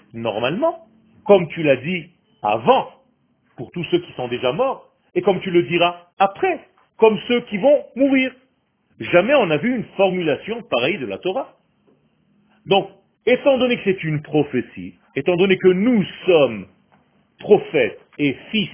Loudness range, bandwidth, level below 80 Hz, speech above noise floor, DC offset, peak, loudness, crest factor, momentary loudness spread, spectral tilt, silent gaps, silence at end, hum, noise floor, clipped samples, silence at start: 4 LU; 3.6 kHz; -58 dBFS; 46 dB; under 0.1%; 0 dBFS; -19 LUFS; 20 dB; 13 LU; -10 dB/octave; 6.13-6.17 s; 0 s; none; -64 dBFS; under 0.1%; 0.15 s